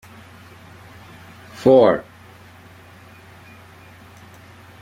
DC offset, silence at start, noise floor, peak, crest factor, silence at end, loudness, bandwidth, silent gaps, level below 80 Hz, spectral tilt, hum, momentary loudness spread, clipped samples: under 0.1%; 1.6 s; -45 dBFS; -2 dBFS; 22 dB; 2.8 s; -16 LUFS; 15 kHz; none; -58 dBFS; -7 dB/octave; none; 30 LU; under 0.1%